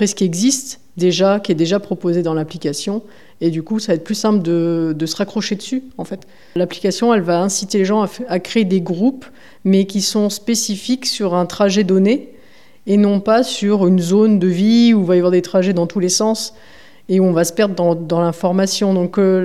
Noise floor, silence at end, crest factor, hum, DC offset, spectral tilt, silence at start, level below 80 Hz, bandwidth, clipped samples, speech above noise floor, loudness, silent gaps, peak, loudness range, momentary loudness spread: -49 dBFS; 0 s; 16 dB; none; 0.8%; -5 dB/octave; 0 s; -62 dBFS; 14 kHz; under 0.1%; 33 dB; -16 LUFS; none; 0 dBFS; 5 LU; 9 LU